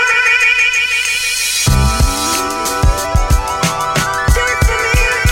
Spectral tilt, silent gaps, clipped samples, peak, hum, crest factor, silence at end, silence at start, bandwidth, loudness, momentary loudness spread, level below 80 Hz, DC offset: -3 dB/octave; none; under 0.1%; 0 dBFS; none; 12 dB; 0 s; 0 s; 17 kHz; -13 LUFS; 6 LU; -18 dBFS; under 0.1%